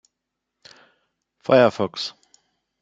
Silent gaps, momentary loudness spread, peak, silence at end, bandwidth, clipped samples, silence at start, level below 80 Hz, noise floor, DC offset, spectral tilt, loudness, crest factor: none; 15 LU; -2 dBFS; 0.7 s; 7.8 kHz; under 0.1%; 1.5 s; -68 dBFS; -81 dBFS; under 0.1%; -5.5 dB/octave; -20 LUFS; 22 dB